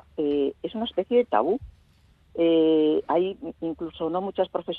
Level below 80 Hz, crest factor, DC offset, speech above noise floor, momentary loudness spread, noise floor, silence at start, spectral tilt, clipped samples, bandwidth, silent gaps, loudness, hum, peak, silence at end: -58 dBFS; 18 dB; under 0.1%; 35 dB; 12 LU; -59 dBFS; 0.2 s; -8.5 dB/octave; under 0.1%; 4.3 kHz; none; -25 LUFS; none; -8 dBFS; 0 s